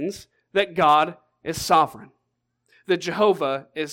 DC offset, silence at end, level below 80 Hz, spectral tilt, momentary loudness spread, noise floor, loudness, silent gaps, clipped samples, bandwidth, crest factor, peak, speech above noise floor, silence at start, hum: under 0.1%; 0 s; -58 dBFS; -4 dB/octave; 14 LU; -75 dBFS; -22 LUFS; none; under 0.1%; 17 kHz; 18 dB; -6 dBFS; 54 dB; 0 s; none